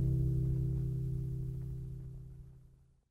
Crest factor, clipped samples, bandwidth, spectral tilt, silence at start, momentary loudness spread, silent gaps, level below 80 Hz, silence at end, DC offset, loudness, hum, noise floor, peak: 14 dB; under 0.1%; 1.4 kHz; -11 dB/octave; 0 s; 19 LU; none; -44 dBFS; 0.4 s; under 0.1%; -37 LUFS; none; -62 dBFS; -22 dBFS